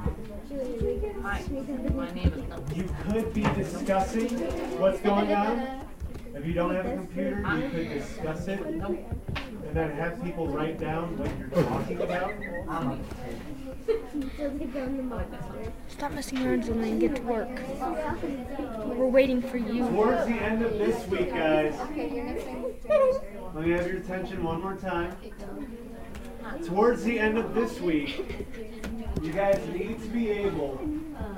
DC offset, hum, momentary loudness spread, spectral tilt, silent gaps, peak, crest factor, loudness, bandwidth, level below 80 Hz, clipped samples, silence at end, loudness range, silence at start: under 0.1%; none; 13 LU; -6.5 dB/octave; none; -10 dBFS; 20 dB; -29 LUFS; 16 kHz; -40 dBFS; under 0.1%; 0 s; 5 LU; 0 s